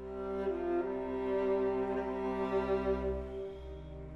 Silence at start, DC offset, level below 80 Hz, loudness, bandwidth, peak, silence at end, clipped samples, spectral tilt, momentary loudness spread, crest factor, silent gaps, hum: 0 s; under 0.1%; -50 dBFS; -35 LUFS; 6 kHz; -22 dBFS; 0 s; under 0.1%; -8.5 dB/octave; 11 LU; 14 dB; none; none